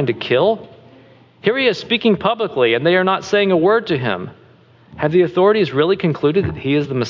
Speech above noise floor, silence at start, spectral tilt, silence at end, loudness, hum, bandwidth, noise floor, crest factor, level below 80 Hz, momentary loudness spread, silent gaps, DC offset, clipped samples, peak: 32 dB; 0 s; -6.5 dB/octave; 0 s; -16 LUFS; none; 7.4 kHz; -48 dBFS; 14 dB; -48 dBFS; 7 LU; none; under 0.1%; under 0.1%; -2 dBFS